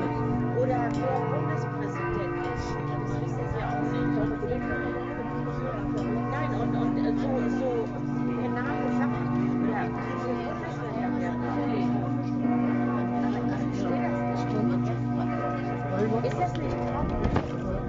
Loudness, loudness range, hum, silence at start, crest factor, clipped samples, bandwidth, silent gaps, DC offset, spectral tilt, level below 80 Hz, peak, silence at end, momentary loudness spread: -28 LUFS; 2 LU; none; 0 s; 20 dB; under 0.1%; 7.6 kHz; none; under 0.1%; -7.5 dB/octave; -44 dBFS; -8 dBFS; 0 s; 4 LU